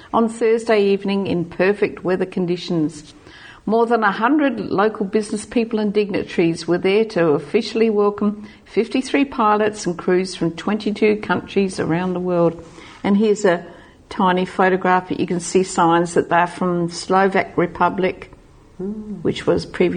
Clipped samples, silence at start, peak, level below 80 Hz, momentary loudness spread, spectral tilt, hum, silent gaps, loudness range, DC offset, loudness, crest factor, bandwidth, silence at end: under 0.1%; 0.05 s; -2 dBFS; -52 dBFS; 7 LU; -6 dB/octave; none; none; 2 LU; under 0.1%; -19 LUFS; 16 dB; 9.8 kHz; 0 s